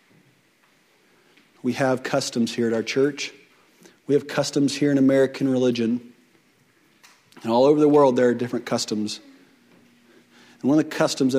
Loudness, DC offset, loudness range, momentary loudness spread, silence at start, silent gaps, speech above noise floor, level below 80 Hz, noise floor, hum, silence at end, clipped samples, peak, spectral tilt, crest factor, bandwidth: -22 LUFS; under 0.1%; 4 LU; 13 LU; 1.65 s; none; 40 dB; -70 dBFS; -61 dBFS; none; 0 s; under 0.1%; -6 dBFS; -5 dB/octave; 18 dB; 15 kHz